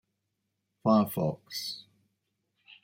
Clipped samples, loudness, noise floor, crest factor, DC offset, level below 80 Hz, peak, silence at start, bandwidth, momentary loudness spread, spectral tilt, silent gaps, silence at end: under 0.1%; -30 LUFS; -82 dBFS; 20 dB; under 0.1%; -70 dBFS; -12 dBFS; 0.85 s; 16.5 kHz; 13 LU; -6.5 dB/octave; none; 1 s